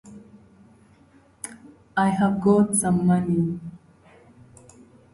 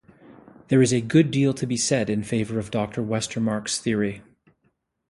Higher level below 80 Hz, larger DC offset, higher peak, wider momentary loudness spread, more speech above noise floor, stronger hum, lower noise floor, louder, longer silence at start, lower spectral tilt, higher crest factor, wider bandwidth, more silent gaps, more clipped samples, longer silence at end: about the same, -56 dBFS vs -56 dBFS; neither; second, -8 dBFS vs -4 dBFS; first, 19 LU vs 8 LU; second, 35 dB vs 48 dB; neither; second, -55 dBFS vs -70 dBFS; about the same, -21 LUFS vs -23 LUFS; second, 0.05 s vs 0.3 s; first, -6.5 dB/octave vs -5 dB/octave; about the same, 18 dB vs 20 dB; about the same, 12 kHz vs 11.5 kHz; neither; neither; first, 1.35 s vs 0.9 s